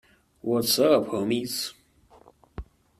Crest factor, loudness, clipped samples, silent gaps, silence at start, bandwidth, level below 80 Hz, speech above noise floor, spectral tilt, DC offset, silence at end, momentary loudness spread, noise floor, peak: 20 dB; -25 LUFS; under 0.1%; none; 0.45 s; 15.5 kHz; -52 dBFS; 32 dB; -4 dB/octave; under 0.1%; 0.35 s; 24 LU; -56 dBFS; -8 dBFS